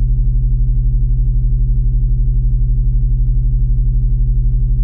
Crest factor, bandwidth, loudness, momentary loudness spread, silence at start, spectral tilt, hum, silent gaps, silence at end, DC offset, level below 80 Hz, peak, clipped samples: 6 dB; 0.5 kHz; -17 LUFS; 0 LU; 0 s; -16 dB/octave; none; none; 0 s; under 0.1%; -12 dBFS; -6 dBFS; under 0.1%